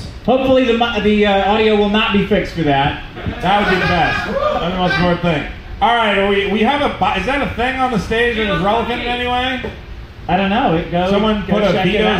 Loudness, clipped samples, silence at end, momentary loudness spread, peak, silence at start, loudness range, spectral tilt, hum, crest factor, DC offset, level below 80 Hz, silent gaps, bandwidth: -15 LUFS; under 0.1%; 0 s; 6 LU; -2 dBFS; 0 s; 3 LU; -6 dB/octave; none; 14 dB; under 0.1%; -32 dBFS; none; 14 kHz